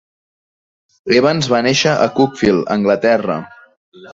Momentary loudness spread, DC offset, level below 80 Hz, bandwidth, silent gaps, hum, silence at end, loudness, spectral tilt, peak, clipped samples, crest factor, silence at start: 6 LU; under 0.1%; -50 dBFS; 8 kHz; 3.77-3.92 s; none; 0 s; -14 LUFS; -5 dB/octave; -2 dBFS; under 0.1%; 16 dB; 1.05 s